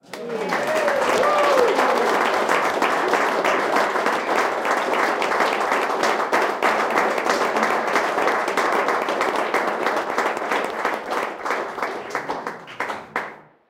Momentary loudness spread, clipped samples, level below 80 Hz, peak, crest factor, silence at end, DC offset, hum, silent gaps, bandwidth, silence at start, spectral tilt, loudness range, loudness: 9 LU; under 0.1%; -64 dBFS; -2 dBFS; 20 dB; 0.3 s; under 0.1%; none; none; 17 kHz; 0.1 s; -3 dB/octave; 5 LU; -21 LUFS